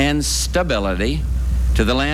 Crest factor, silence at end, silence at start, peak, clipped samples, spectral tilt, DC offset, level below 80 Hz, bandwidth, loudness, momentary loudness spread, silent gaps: 14 dB; 0 s; 0 s; -4 dBFS; under 0.1%; -4.5 dB/octave; under 0.1%; -22 dBFS; 15 kHz; -19 LUFS; 4 LU; none